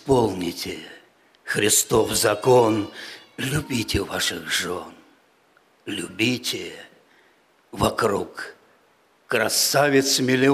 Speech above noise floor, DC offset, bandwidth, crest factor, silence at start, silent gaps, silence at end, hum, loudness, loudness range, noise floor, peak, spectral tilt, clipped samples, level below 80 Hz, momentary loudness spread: 38 dB; under 0.1%; 15.5 kHz; 16 dB; 0.05 s; none; 0 s; none; -21 LUFS; 7 LU; -60 dBFS; -6 dBFS; -3.5 dB/octave; under 0.1%; -48 dBFS; 20 LU